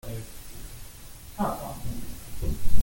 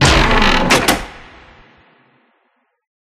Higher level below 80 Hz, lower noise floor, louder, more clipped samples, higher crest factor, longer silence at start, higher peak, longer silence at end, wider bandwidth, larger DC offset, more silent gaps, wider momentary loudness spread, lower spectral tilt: second, -36 dBFS vs -24 dBFS; second, -43 dBFS vs -64 dBFS; second, -36 LUFS vs -12 LUFS; neither; about the same, 18 dB vs 16 dB; about the same, 0.05 s vs 0 s; second, -4 dBFS vs 0 dBFS; second, 0 s vs 1.8 s; about the same, 17 kHz vs 15.5 kHz; neither; neither; first, 13 LU vs 10 LU; first, -5.5 dB/octave vs -3.5 dB/octave